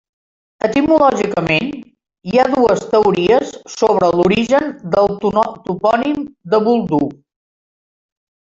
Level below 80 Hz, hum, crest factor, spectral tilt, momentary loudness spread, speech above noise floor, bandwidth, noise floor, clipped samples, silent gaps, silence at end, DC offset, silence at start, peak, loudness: -48 dBFS; none; 14 dB; -6 dB/octave; 8 LU; over 76 dB; 7.8 kHz; under -90 dBFS; under 0.1%; none; 1.4 s; under 0.1%; 0.65 s; 0 dBFS; -15 LUFS